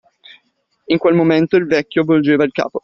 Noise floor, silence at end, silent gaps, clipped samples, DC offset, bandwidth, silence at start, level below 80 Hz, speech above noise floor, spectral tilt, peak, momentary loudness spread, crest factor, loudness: -64 dBFS; 0.05 s; none; under 0.1%; under 0.1%; 6.4 kHz; 0.9 s; -56 dBFS; 50 dB; -5.5 dB/octave; -2 dBFS; 4 LU; 14 dB; -15 LUFS